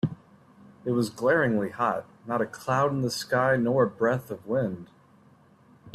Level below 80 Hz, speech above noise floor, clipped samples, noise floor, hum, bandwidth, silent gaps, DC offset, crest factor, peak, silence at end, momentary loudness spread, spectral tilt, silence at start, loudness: -64 dBFS; 32 dB; under 0.1%; -57 dBFS; none; 15 kHz; none; under 0.1%; 16 dB; -10 dBFS; 0.05 s; 10 LU; -6 dB/octave; 0.05 s; -27 LUFS